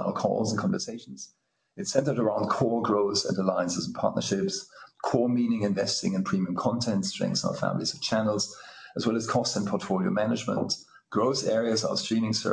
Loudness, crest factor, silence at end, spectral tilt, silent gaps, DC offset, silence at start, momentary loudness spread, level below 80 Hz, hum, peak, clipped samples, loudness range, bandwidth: -28 LUFS; 20 dB; 0 s; -5 dB/octave; none; under 0.1%; 0 s; 8 LU; -66 dBFS; none; -8 dBFS; under 0.1%; 1 LU; 10 kHz